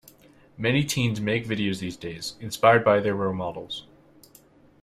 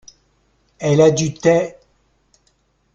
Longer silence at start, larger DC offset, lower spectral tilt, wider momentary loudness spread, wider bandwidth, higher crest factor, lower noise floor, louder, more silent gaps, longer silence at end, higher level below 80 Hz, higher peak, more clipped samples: second, 0.6 s vs 0.8 s; neither; about the same, -5 dB/octave vs -5.5 dB/octave; first, 15 LU vs 11 LU; first, 15.5 kHz vs 7.8 kHz; about the same, 22 dB vs 18 dB; second, -55 dBFS vs -62 dBFS; second, -24 LUFS vs -16 LUFS; neither; second, 1 s vs 1.25 s; about the same, -58 dBFS vs -54 dBFS; about the same, -4 dBFS vs -2 dBFS; neither